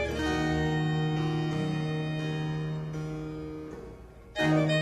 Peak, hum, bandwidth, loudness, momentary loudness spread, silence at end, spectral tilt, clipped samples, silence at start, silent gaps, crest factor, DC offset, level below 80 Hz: -14 dBFS; none; 10.5 kHz; -30 LUFS; 13 LU; 0 s; -6.5 dB/octave; under 0.1%; 0 s; none; 16 dB; under 0.1%; -46 dBFS